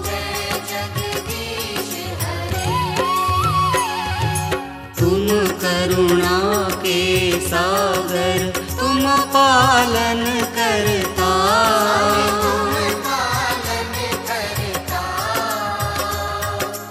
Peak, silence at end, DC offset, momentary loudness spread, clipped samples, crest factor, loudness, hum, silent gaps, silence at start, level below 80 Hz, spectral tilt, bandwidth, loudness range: -4 dBFS; 0 s; under 0.1%; 9 LU; under 0.1%; 16 dB; -18 LUFS; none; none; 0 s; -38 dBFS; -4 dB/octave; 16.5 kHz; 6 LU